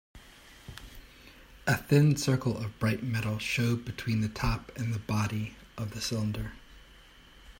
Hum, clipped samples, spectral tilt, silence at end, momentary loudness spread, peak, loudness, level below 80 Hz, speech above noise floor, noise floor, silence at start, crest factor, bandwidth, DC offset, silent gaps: none; under 0.1%; -5.5 dB/octave; 0.05 s; 22 LU; -10 dBFS; -30 LUFS; -48 dBFS; 25 dB; -55 dBFS; 0.15 s; 20 dB; 16.5 kHz; under 0.1%; none